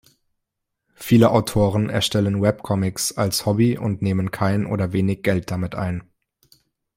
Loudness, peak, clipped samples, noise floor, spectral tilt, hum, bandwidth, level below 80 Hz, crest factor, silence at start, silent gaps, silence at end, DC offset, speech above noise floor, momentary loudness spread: -21 LUFS; -2 dBFS; under 0.1%; -79 dBFS; -5.5 dB/octave; none; 16 kHz; -50 dBFS; 20 dB; 1 s; none; 0.95 s; under 0.1%; 60 dB; 9 LU